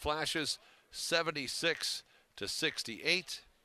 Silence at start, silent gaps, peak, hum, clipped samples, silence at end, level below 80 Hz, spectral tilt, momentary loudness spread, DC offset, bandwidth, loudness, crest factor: 0 s; none; -16 dBFS; none; under 0.1%; 0.25 s; -62 dBFS; -2 dB/octave; 10 LU; under 0.1%; 14.5 kHz; -35 LUFS; 22 dB